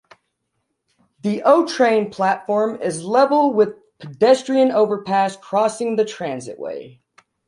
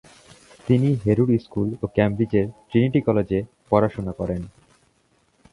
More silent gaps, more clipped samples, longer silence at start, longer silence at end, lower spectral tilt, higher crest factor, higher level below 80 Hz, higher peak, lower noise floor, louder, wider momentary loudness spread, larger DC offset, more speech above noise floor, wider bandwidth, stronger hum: neither; neither; first, 1.25 s vs 0.65 s; second, 0.6 s vs 1.05 s; second, -5 dB/octave vs -9 dB/octave; about the same, 18 dB vs 20 dB; second, -68 dBFS vs -46 dBFS; about the same, -2 dBFS vs -2 dBFS; first, -74 dBFS vs -64 dBFS; first, -18 LUFS vs -22 LUFS; first, 14 LU vs 9 LU; neither; first, 56 dB vs 43 dB; about the same, 11.5 kHz vs 11 kHz; neither